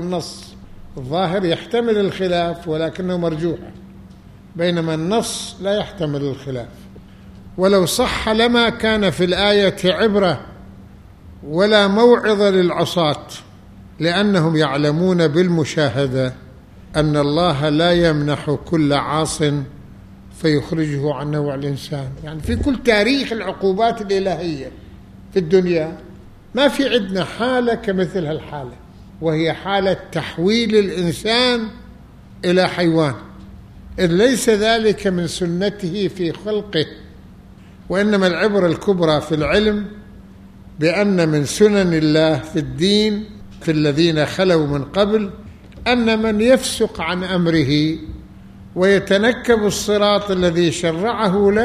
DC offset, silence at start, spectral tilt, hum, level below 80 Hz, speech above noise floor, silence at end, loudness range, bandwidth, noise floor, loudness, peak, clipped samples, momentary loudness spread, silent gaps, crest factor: under 0.1%; 0 s; -5.5 dB/octave; none; -42 dBFS; 24 dB; 0 s; 5 LU; 15 kHz; -41 dBFS; -17 LUFS; 0 dBFS; under 0.1%; 12 LU; none; 18 dB